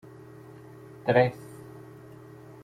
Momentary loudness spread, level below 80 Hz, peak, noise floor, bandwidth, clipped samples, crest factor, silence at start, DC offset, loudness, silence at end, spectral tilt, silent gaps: 25 LU; -66 dBFS; -8 dBFS; -47 dBFS; 15.5 kHz; under 0.1%; 24 dB; 1.05 s; under 0.1%; -25 LUFS; 0.85 s; -7.5 dB/octave; none